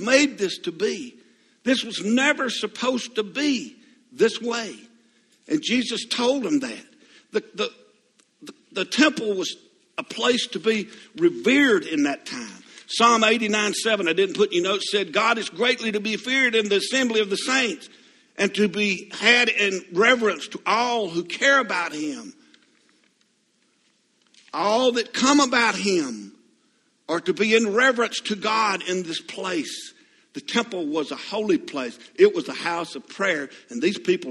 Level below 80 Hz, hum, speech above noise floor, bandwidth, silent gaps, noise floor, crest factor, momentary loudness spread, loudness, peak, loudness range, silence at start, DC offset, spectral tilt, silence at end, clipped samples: -72 dBFS; none; 44 dB; 12.5 kHz; none; -66 dBFS; 22 dB; 14 LU; -22 LUFS; -2 dBFS; 6 LU; 0 s; under 0.1%; -3 dB/octave; 0 s; under 0.1%